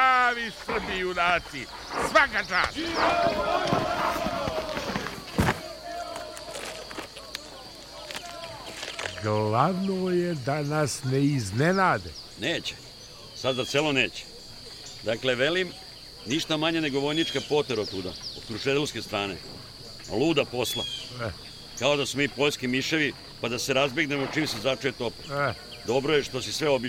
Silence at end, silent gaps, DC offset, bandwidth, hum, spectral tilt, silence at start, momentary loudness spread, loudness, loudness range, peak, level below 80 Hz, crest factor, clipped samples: 0 s; none; under 0.1%; 16 kHz; none; -4 dB/octave; 0 s; 14 LU; -27 LUFS; 6 LU; -6 dBFS; -52 dBFS; 22 dB; under 0.1%